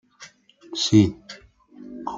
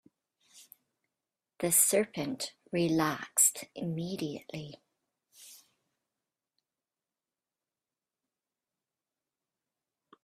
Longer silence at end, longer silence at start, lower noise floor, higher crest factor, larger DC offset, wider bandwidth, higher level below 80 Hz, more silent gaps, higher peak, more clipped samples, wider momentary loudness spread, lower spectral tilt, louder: second, 0 s vs 4.65 s; second, 0.2 s vs 0.55 s; second, -49 dBFS vs under -90 dBFS; about the same, 22 dB vs 26 dB; neither; second, 7.8 kHz vs 15.5 kHz; first, -58 dBFS vs -74 dBFS; neither; first, -4 dBFS vs -10 dBFS; neither; first, 25 LU vs 17 LU; first, -5.5 dB/octave vs -3 dB/octave; first, -20 LUFS vs -29 LUFS